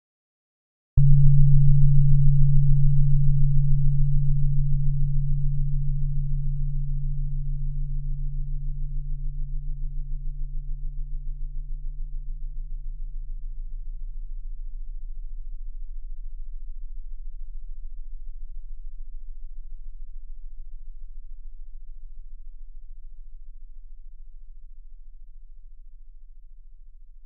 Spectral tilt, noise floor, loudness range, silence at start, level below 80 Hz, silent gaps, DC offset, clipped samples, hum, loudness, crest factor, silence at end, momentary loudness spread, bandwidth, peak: -23.5 dB/octave; -42 dBFS; 26 LU; 0.95 s; -24 dBFS; none; under 0.1%; under 0.1%; none; -25 LUFS; 18 dB; 0 s; 26 LU; 0.2 kHz; -4 dBFS